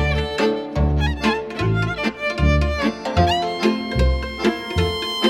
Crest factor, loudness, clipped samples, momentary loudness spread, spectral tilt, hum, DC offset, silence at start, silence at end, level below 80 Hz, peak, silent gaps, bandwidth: 16 dB; -21 LUFS; under 0.1%; 4 LU; -6 dB/octave; none; under 0.1%; 0 s; 0 s; -26 dBFS; -4 dBFS; none; 12.5 kHz